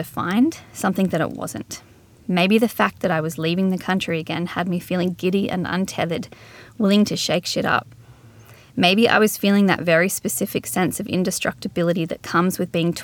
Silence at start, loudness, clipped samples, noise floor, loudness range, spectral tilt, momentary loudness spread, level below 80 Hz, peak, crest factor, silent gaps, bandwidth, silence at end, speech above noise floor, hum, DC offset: 0 s; -21 LUFS; under 0.1%; -46 dBFS; 4 LU; -5 dB/octave; 8 LU; -58 dBFS; -2 dBFS; 20 dB; none; over 20 kHz; 0 s; 26 dB; none; under 0.1%